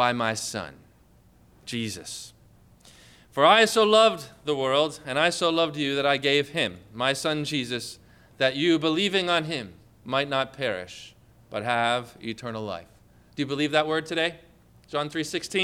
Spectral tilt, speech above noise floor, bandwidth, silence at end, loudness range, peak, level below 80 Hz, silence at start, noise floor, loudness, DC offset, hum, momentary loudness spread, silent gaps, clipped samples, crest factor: -3.5 dB/octave; 32 dB; 16 kHz; 0 s; 7 LU; -6 dBFS; -62 dBFS; 0 s; -57 dBFS; -25 LUFS; under 0.1%; none; 17 LU; none; under 0.1%; 20 dB